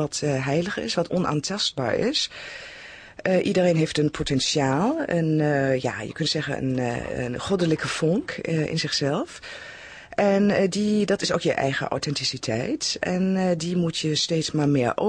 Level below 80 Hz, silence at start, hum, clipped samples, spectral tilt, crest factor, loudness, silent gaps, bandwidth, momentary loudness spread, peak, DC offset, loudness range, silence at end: -52 dBFS; 0 s; none; under 0.1%; -5 dB/octave; 16 dB; -24 LUFS; none; 10 kHz; 8 LU; -8 dBFS; under 0.1%; 3 LU; 0 s